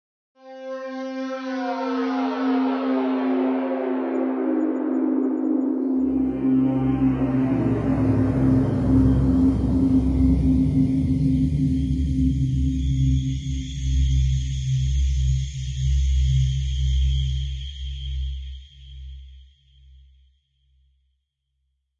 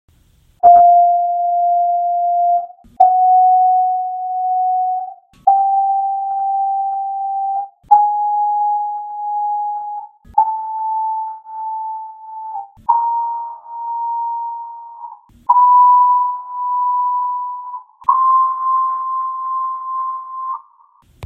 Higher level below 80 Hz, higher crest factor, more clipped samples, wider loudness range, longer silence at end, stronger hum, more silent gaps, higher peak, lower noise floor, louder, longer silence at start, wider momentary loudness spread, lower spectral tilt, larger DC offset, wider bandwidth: first, -28 dBFS vs -60 dBFS; about the same, 14 dB vs 16 dB; neither; about the same, 8 LU vs 8 LU; first, 2.55 s vs 0 s; neither; neither; second, -8 dBFS vs 0 dBFS; first, -75 dBFS vs -53 dBFS; second, -22 LUFS vs -16 LUFS; second, 0.45 s vs 0.65 s; second, 11 LU vs 18 LU; about the same, -8 dB/octave vs -7 dB/octave; neither; first, 7.6 kHz vs 1.7 kHz